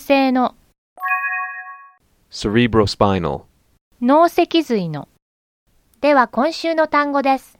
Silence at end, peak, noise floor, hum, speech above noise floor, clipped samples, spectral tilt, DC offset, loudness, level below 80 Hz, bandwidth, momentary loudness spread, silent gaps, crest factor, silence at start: 0.2 s; 0 dBFS; -51 dBFS; none; 34 dB; under 0.1%; -6 dB/octave; under 0.1%; -18 LUFS; -44 dBFS; 16 kHz; 13 LU; 0.78-0.96 s, 3.81-3.91 s, 5.22-5.66 s; 18 dB; 0 s